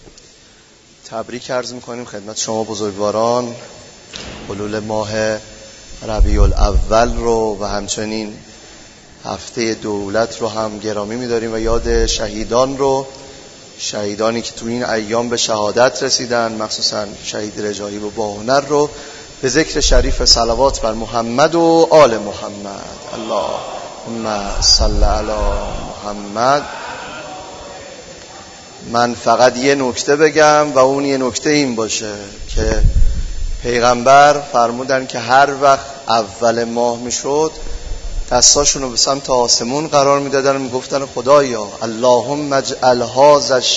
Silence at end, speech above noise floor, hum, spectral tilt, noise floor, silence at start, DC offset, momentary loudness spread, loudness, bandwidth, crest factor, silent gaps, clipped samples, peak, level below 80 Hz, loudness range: 0 s; 31 dB; none; -3 dB/octave; -46 dBFS; 0.05 s; under 0.1%; 18 LU; -15 LUFS; 8.2 kHz; 16 dB; none; under 0.1%; 0 dBFS; -24 dBFS; 8 LU